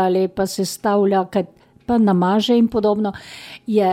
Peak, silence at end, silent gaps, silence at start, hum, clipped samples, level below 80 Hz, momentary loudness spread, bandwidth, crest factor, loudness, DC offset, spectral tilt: -6 dBFS; 0 s; none; 0 s; none; under 0.1%; -52 dBFS; 17 LU; 16 kHz; 12 dB; -18 LUFS; under 0.1%; -6 dB/octave